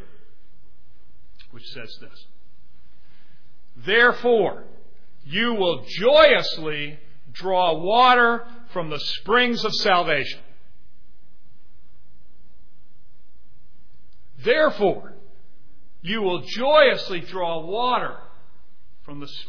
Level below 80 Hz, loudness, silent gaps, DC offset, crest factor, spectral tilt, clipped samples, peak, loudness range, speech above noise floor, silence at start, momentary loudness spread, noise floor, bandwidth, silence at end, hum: -54 dBFS; -20 LUFS; none; 4%; 20 dB; -4.5 dB/octave; under 0.1%; -2 dBFS; 8 LU; 37 dB; 1.55 s; 23 LU; -58 dBFS; 5.4 kHz; 0.05 s; none